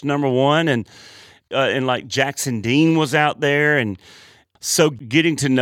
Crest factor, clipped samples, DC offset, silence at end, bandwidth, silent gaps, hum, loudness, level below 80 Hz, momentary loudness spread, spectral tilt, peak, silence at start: 16 dB; under 0.1%; under 0.1%; 0 s; 17 kHz; none; none; -18 LUFS; -62 dBFS; 9 LU; -4.5 dB/octave; -2 dBFS; 0 s